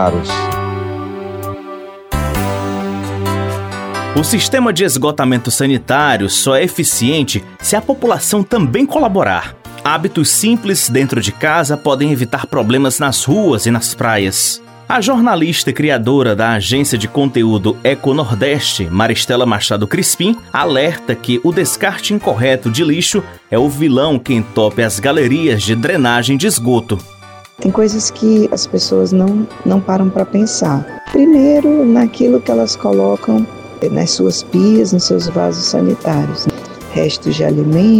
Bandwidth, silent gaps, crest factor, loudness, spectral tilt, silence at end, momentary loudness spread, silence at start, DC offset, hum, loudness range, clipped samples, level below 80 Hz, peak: 19 kHz; none; 12 dB; -13 LUFS; -4.5 dB/octave; 0 s; 8 LU; 0 s; under 0.1%; none; 2 LU; under 0.1%; -40 dBFS; 0 dBFS